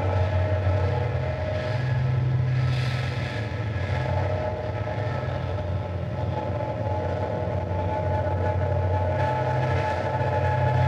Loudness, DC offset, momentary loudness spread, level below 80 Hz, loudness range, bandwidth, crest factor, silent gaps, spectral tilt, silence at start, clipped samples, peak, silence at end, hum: -26 LUFS; under 0.1%; 5 LU; -42 dBFS; 3 LU; 7.6 kHz; 14 dB; none; -8 dB/octave; 0 s; under 0.1%; -10 dBFS; 0 s; none